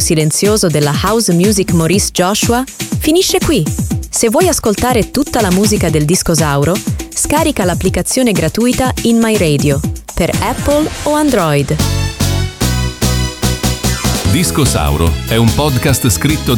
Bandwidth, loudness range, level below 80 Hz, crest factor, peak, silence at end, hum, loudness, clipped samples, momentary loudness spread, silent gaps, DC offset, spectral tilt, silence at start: 19 kHz; 2 LU; -26 dBFS; 12 dB; 0 dBFS; 0 s; none; -12 LUFS; under 0.1%; 4 LU; none; under 0.1%; -4.5 dB/octave; 0 s